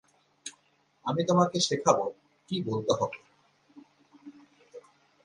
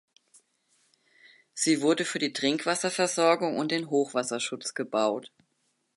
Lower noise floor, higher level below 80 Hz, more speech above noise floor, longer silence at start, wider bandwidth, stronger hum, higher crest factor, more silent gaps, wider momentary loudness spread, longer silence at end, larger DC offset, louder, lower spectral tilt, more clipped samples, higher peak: second, -68 dBFS vs -75 dBFS; first, -70 dBFS vs -80 dBFS; second, 41 dB vs 48 dB; second, 0.45 s vs 1.55 s; about the same, 11.5 kHz vs 11.5 kHz; neither; first, 26 dB vs 20 dB; neither; first, 20 LU vs 7 LU; second, 0.45 s vs 0.7 s; neither; about the same, -28 LUFS vs -27 LUFS; first, -4.5 dB/octave vs -3 dB/octave; neither; first, -6 dBFS vs -10 dBFS